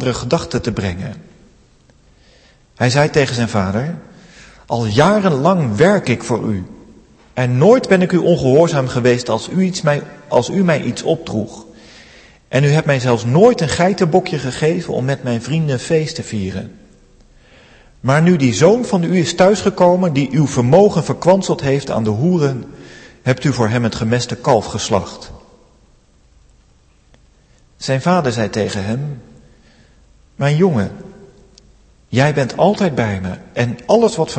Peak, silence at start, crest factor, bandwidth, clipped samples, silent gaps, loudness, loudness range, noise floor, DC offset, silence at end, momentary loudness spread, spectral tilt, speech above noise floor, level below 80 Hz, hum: 0 dBFS; 0 s; 16 dB; 8.8 kHz; under 0.1%; none; -15 LUFS; 7 LU; -51 dBFS; under 0.1%; 0 s; 12 LU; -6 dB/octave; 37 dB; -46 dBFS; none